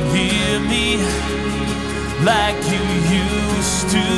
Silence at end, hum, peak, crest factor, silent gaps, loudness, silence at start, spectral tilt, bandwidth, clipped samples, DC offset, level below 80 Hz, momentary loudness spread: 0 s; none; -2 dBFS; 16 dB; none; -18 LUFS; 0 s; -4 dB/octave; 12 kHz; under 0.1%; under 0.1%; -30 dBFS; 5 LU